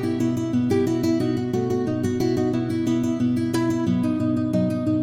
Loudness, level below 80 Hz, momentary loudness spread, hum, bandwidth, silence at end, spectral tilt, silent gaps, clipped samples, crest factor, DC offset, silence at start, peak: -23 LUFS; -52 dBFS; 2 LU; none; 16 kHz; 0 s; -7.5 dB/octave; none; under 0.1%; 12 dB; under 0.1%; 0 s; -10 dBFS